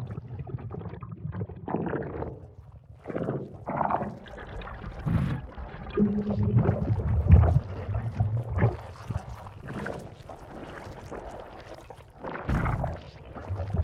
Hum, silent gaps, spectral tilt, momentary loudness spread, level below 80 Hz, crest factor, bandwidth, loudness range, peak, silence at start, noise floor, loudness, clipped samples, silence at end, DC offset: none; none; -9.5 dB/octave; 18 LU; -36 dBFS; 24 dB; 7 kHz; 11 LU; -6 dBFS; 0 s; -48 dBFS; -30 LUFS; under 0.1%; 0 s; under 0.1%